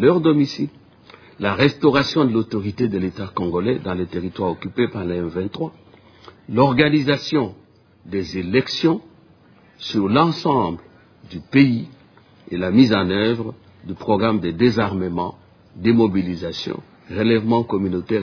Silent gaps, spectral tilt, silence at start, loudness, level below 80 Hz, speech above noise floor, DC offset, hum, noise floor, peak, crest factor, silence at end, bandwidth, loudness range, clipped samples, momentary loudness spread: none; -7 dB/octave; 0 s; -20 LUFS; -52 dBFS; 32 dB; under 0.1%; none; -51 dBFS; -2 dBFS; 18 dB; 0 s; 5.4 kHz; 4 LU; under 0.1%; 13 LU